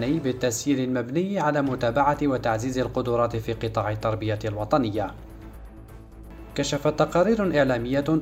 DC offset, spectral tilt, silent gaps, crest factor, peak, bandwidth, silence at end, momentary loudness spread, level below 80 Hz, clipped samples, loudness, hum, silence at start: under 0.1%; -6 dB/octave; none; 18 dB; -6 dBFS; 16 kHz; 0 s; 17 LU; -44 dBFS; under 0.1%; -25 LUFS; none; 0 s